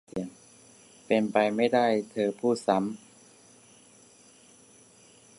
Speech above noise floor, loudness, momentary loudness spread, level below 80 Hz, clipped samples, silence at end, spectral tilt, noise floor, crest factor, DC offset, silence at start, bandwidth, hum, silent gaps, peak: 31 dB; -27 LUFS; 13 LU; -72 dBFS; under 0.1%; 2.4 s; -5.5 dB/octave; -57 dBFS; 22 dB; under 0.1%; 0.15 s; 11.5 kHz; none; none; -8 dBFS